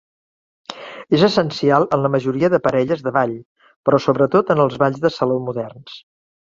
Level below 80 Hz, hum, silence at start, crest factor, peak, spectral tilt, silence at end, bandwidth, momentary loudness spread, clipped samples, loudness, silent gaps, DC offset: -56 dBFS; none; 0.7 s; 18 dB; -2 dBFS; -7 dB/octave; 0.5 s; 7.6 kHz; 19 LU; under 0.1%; -18 LUFS; 3.46-3.56 s, 3.76-3.83 s; under 0.1%